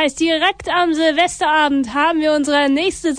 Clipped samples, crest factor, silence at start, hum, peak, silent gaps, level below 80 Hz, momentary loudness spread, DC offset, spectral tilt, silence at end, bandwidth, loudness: under 0.1%; 14 dB; 0 s; none; -2 dBFS; none; -48 dBFS; 2 LU; under 0.1%; -2.5 dB/octave; 0 s; 10 kHz; -16 LUFS